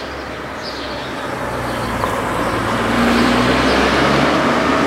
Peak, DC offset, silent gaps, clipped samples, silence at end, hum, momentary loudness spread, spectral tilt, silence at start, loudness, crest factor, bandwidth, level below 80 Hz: -2 dBFS; under 0.1%; none; under 0.1%; 0 s; none; 12 LU; -5 dB/octave; 0 s; -17 LUFS; 16 dB; 16 kHz; -34 dBFS